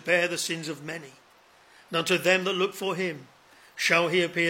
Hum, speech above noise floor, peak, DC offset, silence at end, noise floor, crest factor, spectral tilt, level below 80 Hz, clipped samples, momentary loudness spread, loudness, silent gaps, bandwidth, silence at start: none; 31 dB; -6 dBFS; under 0.1%; 0 s; -57 dBFS; 20 dB; -3.5 dB/octave; -80 dBFS; under 0.1%; 15 LU; -26 LUFS; none; 16.5 kHz; 0.05 s